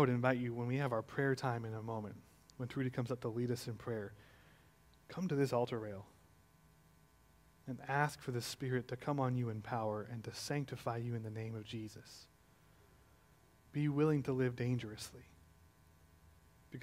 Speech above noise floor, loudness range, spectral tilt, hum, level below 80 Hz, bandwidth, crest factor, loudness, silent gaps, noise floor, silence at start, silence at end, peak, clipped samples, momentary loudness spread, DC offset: 29 dB; 4 LU; -6.5 dB/octave; none; -70 dBFS; 16 kHz; 24 dB; -39 LUFS; none; -68 dBFS; 0 s; 0 s; -18 dBFS; under 0.1%; 16 LU; under 0.1%